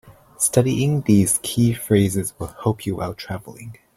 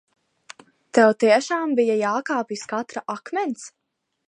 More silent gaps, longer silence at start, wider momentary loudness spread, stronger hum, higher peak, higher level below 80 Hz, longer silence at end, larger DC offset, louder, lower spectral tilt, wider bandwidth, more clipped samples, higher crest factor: neither; second, 0.05 s vs 0.95 s; about the same, 15 LU vs 13 LU; neither; about the same, -2 dBFS vs -2 dBFS; first, -48 dBFS vs -80 dBFS; second, 0.25 s vs 0.6 s; neither; about the same, -20 LUFS vs -22 LUFS; first, -5.5 dB/octave vs -4 dB/octave; first, 16 kHz vs 10.5 kHz; neither; about the same, 18 dB vs 20 dB